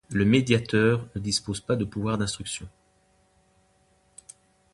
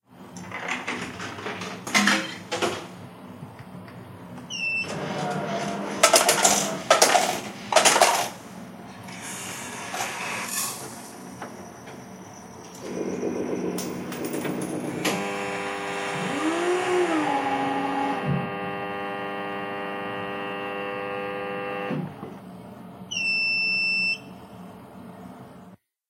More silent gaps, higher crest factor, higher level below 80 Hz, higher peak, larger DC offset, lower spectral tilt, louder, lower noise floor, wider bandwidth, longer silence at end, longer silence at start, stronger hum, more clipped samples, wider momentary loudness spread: neither; second, 22 dB vs 28 dB; first, -52 dBFS vs -66 dBFS; second, -6 dBFS vs 0 dBFS; neither; first, -5 dB/octave vs -2.5 dB/octave; about the same, -25 LUFS vs -25 LUFS; first, -64 dBFS vs -50 dBFS; second, 11.5 kHz vs 16 kHz; first, 2.05 s vs 0.35 s; about the same, 0.1 s vs 0.1 s; neither; neither; second, 17 LU vs 23 LU